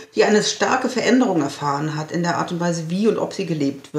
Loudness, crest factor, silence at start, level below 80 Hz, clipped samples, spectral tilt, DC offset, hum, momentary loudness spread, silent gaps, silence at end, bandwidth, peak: -20 LUFS; 16 dB; 0 s; -70 dBFS; under 0.1%; -5 dB/octave; under 0.1%; none; 7 LU; none; 0 s; 14 kHz; -4 dBFS